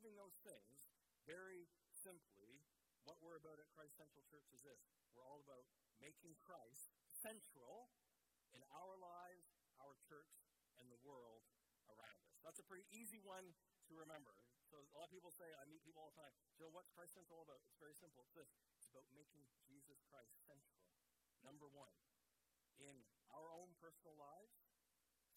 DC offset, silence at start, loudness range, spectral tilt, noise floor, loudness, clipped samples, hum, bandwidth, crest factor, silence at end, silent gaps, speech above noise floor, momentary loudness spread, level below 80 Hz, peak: under 0.1%; 0 s; 6 LU; -3 dB/octave; -88 dBFS; -64 LUFS; under 0.1%; none; 17 kHz; 24 dB; 0 s; none; 23 dB; 10 LU; under -90 dBFS; -42 dBFS